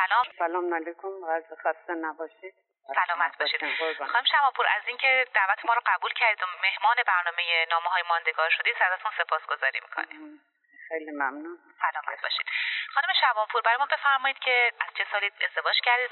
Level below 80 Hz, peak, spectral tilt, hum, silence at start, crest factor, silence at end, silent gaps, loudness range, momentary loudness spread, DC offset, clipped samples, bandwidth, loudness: under -90 dBFS; -8 dBFS; 6.5 dB/octave; none; 0 s; 20 dB; 0 s; none; 7 LU; 10 LU; under 0.1%; under 0.1%; 4.4 kHz; -25 LUFS